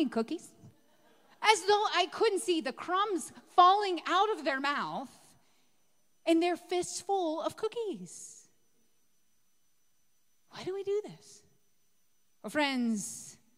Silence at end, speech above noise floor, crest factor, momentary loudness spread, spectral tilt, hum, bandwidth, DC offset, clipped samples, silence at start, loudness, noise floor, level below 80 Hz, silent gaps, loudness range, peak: 0.25 s; 46 dB; 24 dB; 17 LU; -2.5 dB/octave; none; 16 kHz; under 0.1%; under 0.1%; 0 s; -30 LUFS; -76 dBFS; -80 dBFS; none; 14 LU; -8 dBFS